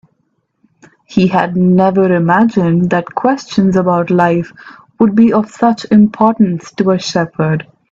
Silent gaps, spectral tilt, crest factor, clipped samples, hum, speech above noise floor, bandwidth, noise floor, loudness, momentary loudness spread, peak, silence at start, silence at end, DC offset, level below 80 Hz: none; -7.5 dB/octave; 12 dB; under 0.1%; none; 52 dB; 7.6 kHz; -64 dBFS; -12 LUFS; 6 LU; 0 dBFS; 1.1 s; 0.3 s; under 0.1%; -50 dBFS